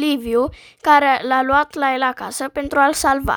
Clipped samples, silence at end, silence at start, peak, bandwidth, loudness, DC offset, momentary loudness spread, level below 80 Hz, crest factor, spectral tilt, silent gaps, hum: under 0.1%; 0 s; 0 s; 0 dBFS; over 20 kHz; -17 LUFS; under 0.1%; 11 LU; -40 dBFS; 16 dB; -3.5 dB/octave; none; none